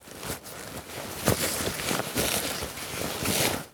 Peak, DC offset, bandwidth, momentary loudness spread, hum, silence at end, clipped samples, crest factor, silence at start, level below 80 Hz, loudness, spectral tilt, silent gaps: -6 dBFS; under 0.1%; over 20 kHz; 12 LU; none; 0 s; under 0.1%; 24 dB; 0 s; -50 dBFS; -29 LUFS; -2.5 dB/octave; none